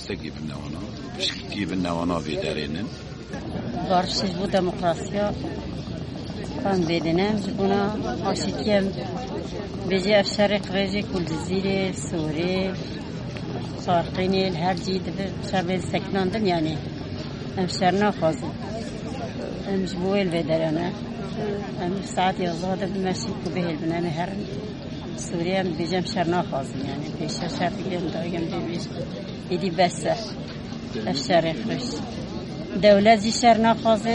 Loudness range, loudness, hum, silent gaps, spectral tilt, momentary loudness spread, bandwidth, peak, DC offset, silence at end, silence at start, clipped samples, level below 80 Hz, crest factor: 3 LU; -25 LUFS; none; none; -5.5 dB/octave; 12 LU; 11 kHz; -4 dBFS; under 0.1%; 0 s; 0 s; under 0.1%; -46 dBFS; 20 dB